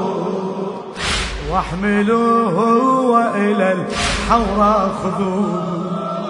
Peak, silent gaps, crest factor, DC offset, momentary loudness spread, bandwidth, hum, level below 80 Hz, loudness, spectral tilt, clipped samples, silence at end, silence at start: 0 dBFS; none; 16 dB; under 0.1%; 8 LU; 11 kHz; none; -34 dBFS; -17 LUFS; -5.5 dB/octave; under 0.1%; 0 s; 0 s